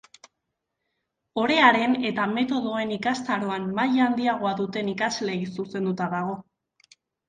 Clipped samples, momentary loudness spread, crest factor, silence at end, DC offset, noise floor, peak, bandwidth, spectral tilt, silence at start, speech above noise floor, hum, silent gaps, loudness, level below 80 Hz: under 0.1%; 12 LU; 22 dB; 0.85 s; under 0.1%; -81 dBFS; -4 dBFS; 9.4 kHz; -5 dB/octave; 1.35 s; 57 dB; none; none; -24 LUFS; -68 dBFS